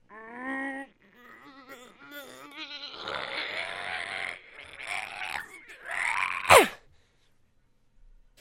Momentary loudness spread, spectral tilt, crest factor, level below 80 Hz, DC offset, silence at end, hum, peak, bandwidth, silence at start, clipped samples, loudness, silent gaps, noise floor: 27 LU; -2 dB/octave; 28 dB; -62 dBFS; under 0.1%; 1.65 s; none; -2 dBFS; 16 kHz; 0.1 s; under 0.1%; -28 LUFS; none; -65 dBFS